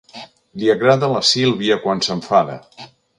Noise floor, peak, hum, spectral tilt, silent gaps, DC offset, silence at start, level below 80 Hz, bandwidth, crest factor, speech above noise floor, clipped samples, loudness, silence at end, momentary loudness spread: -40 dBFS; 0 dBFS; none; -4.5 dB/octave; none; under 0.1%; 0.15 s; -58 dBFS; 11 kHz; 18 dB; 23 dB; under 0.1%; -16 LUFS; 0.3 s; 20 LU